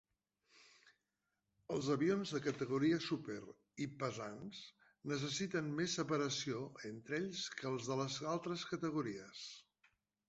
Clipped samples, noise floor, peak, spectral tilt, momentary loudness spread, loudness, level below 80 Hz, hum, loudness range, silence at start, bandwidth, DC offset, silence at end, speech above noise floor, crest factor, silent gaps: under 0.1%; -88 dBFS; -24 dBFS; -4.5 dB/octave; 14 LU; -41 LUFS; -78 dBFS; none; 3 LU; 0.55 s; 8 kHz; under 0.1%; 0.65 s; 48 dB; 18 dB; none